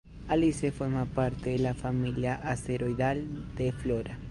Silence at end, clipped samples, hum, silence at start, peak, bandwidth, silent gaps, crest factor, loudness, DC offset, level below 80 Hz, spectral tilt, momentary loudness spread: 0 s; under 0.1%; none; 0.05 s; -14 dBFS; 11.5 kHz; none; 16 dB; -31 LUFS; under 0.1%; -46 dBFS; -7 dB/octave; 6 LU